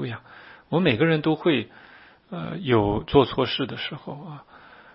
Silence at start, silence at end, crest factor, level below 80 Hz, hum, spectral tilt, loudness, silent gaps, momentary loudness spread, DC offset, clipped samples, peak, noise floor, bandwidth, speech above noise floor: 0 s; 0.4 s; 22 dB; -48 dBFS; none; -11 dB/octave; -23 LUFS; none; 18 LU; under 0.1%; under 0.1%; -2 dBFS; -48 dBFS; 5.8 kHz; 25 dB